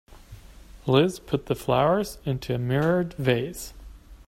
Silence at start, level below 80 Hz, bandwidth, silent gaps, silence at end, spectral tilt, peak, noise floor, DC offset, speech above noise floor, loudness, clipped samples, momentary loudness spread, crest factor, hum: 0.1 s; -48 dBFS; 16 kHz; none; 0.1 s; -6.5 dB/octave; -4 dBFS; -47 dBFS; under 0.1%; 22 dB; -25 LUFS; under 0.1%; 12 LU; 20 dB; none